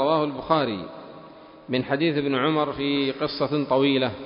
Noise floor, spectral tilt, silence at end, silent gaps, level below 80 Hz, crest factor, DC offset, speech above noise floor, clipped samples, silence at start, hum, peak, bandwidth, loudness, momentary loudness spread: -46 dBFS; -10.5 dB/octave; 0 s; none; -58 dBFS; 18 dB; under 0.1%; 22 dB; under 0.1%; 0 s; none; -6 dBFS; 5.4 kHz; -24 LUFS; 14 LU